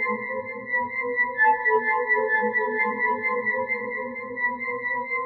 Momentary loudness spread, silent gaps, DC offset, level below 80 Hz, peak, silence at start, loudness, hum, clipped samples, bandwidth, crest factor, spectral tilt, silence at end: 9 LU; none; under 0.1%; -72 dBFS; -10 dBFS; 0 s; -24 LUFS; none; under 0.1%; 4.4 kHz; 16 dB; -3 dB/octave; 0 s